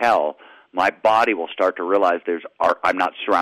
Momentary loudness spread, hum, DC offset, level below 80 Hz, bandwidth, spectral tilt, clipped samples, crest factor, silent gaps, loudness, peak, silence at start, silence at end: 7 LU; none; under 0.1%; -62 dBFS; 14.5 kHz; -4 dB/octave; under 0.1%; 14 dB; none; -20 LUFS; -6 dBFS; 0 s; 0 s